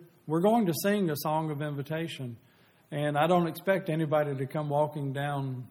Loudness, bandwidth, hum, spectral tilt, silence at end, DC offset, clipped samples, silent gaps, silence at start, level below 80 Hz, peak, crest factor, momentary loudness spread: -29 LUFS; 18.5 kHz; none; -6.5 dB/octave; 0.05 s; under 0.1%; under 0.1%; none; 0 s; -72 dBFS; -12 dBFS; 18 dB; 9 LU